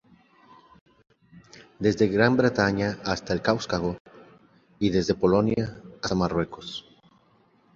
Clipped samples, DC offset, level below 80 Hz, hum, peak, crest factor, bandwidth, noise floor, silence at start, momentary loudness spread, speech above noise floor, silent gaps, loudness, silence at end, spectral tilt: under 0.1%; under 0.1%; -50 dBFS; none; -4 dBFS; 22 dB; 7.6 kHz; -62 dBFS; 1.35 s; 13 LU; 38 dB; 4.00-4.05 s; -25 LUFS; 0.95 s; -6 dB/octave